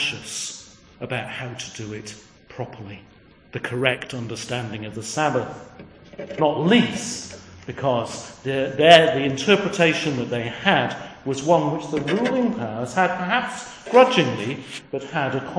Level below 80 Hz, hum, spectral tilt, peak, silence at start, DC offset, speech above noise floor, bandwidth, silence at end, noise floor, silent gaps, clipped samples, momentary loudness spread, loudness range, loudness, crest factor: -58 dBFS; none; -4.5 dB/octave; 0 dBFS; 0 s; under 0.1%; 20 dB; 10.5 kHz; 0 s; -42 dBFS; none; under 0.1%; 18 LU; 11 LU; -21 LUFS; 22 dB